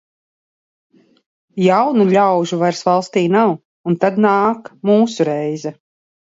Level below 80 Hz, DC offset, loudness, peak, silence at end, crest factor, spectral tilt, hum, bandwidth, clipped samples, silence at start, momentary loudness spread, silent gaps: -66 dBFS; under 0.1%; -16 LUFS; 0 dBFS; 0.65 s; 16 dB; -6.5 dB/octave; none; 7.8 kHz; under 0.1%; 1.55 s; 10 LU; 3.65-3.84 s